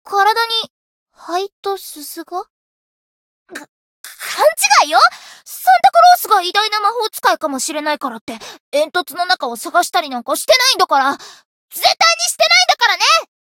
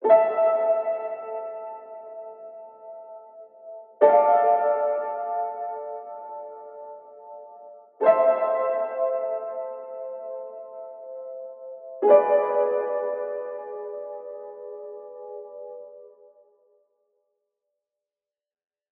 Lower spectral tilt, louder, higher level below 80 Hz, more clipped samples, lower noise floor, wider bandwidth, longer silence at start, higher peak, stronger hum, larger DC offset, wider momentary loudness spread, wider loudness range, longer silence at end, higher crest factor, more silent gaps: second, 1 dB/octave vs -3.5 dB/octave; first, -14 LUFS vs -23 LUFS; first, -66 dBFS vs under -90 dBFS; neither; about the same, under -90 dBFS vs under -90 dBFS; first, 17.5 kHz vs 3.6 kHz; about the same, 0.05 s vs 0 s; first, 0 dBFS vs -4 dBFS; neither; neither; second, 19 LU vs 24 LU; second, 11 LU vs 16 LU; second, 0.2 s vs 2.9 s; second, 16 dB vs 22 dB; first, 0.70-1.06 s, 1.52-1.63 s, 2.50-3.46 s, 3.69-4.04 s, 8.21-8.27 s, 8.60-8.72 s, 11.45-11.68 s vs none